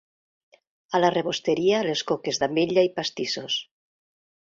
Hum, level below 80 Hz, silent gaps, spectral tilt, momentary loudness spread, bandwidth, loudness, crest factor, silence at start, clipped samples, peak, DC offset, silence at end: none; -66 dBFS; none; -4 dB/octave; 7 LU; 7.8 kHz; -24 LUFS; 20 dB; 0.9 s; under 0.1%; -6 dBFS; under 0.1%; 0.8 s